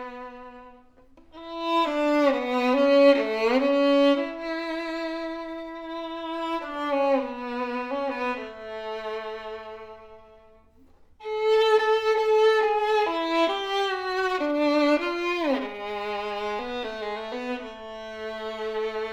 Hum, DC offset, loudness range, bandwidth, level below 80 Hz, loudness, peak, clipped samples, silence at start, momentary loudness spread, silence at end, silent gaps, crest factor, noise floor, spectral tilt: none; under 0.1%; 10 LU; 11.5 kHz; -60 dBFS; -25 LUFS; -8 dBFS; under 0.1%; 0 s; 16 LU; 0 s; none; 18 dB; -55 dBFS; -3.5 dB/octave